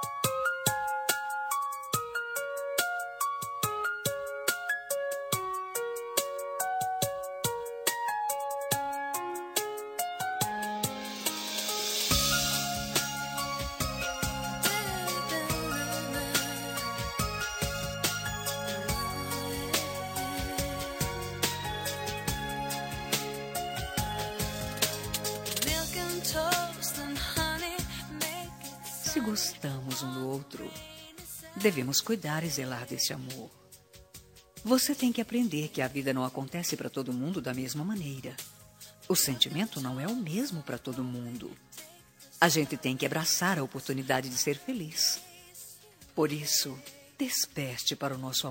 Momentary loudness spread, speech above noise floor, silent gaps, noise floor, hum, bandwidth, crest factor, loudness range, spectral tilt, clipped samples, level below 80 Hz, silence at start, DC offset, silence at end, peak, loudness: 11 LU; 24 dB; none; -55 dBFS; none; 16.5 kHz; 28 dB; 4 LU; -3 dB/octave; under 0.1%; -52 dBFS; 0 s; under 0.1%; 0 s; -6 dBFS; -31 LUFS